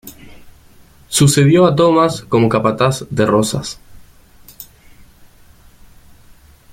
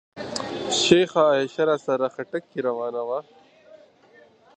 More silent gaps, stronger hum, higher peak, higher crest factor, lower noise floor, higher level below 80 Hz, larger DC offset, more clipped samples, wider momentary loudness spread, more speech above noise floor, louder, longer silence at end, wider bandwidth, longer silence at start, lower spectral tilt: neither; neither; about the same, 0 dBFS vs -2 dBFS; second, 16 dB vs 22 dB; second, -45 dBFS vs -54 dBFS; first, -46 dBFS vs -62 dBFS; neither; neither; first, 26 LU vs 13 LU; about the same, 32 dB vs 32 dB; first, -13 LUFS vs -23 LUFS; first, 2.1 s vs 0.8 s; first, 16.5 kHz vs 10 kHz; about the same, 0.05 s vs 0.15 s; first, -5.5 dB/octave vs -4 dB/octave